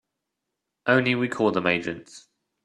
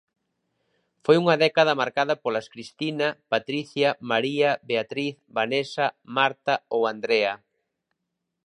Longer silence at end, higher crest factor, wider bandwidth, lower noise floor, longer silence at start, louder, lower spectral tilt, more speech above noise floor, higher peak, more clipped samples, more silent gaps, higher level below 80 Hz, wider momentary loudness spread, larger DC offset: second, 0.45 s vs 1.1 s; about the same, 22 dB vs 22 dB; about the same, 11 kHz vs 11 kHz; about the same, -83 dBFS vs -81 dBFS; second, 0.85 s vs 1.1 s; about the same, -23 LUFS vs -24 LUFS; about the same, -6 dB/octave vs -5 dB/octave; about the same, 59 dB vs 57 dB; about the same, -4 dBFS vs -4 dBFS; neither; neither; first, -64 dBFS vs -76 dBFS; about the same, 12 LU vs 10 LU; neither